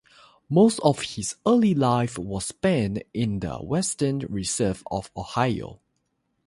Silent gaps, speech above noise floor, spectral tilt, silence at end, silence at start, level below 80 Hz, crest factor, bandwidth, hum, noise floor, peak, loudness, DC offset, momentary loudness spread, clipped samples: none; 50 dB; -5.5 dB/octave; 0.7 s; 0.5 s; -50 dBFS; 20 dB; 11.5 kHz; none; -74 dBFS; -4 dBFS; -24 LUFS; under 0.1%; 11 LU; under 0.1%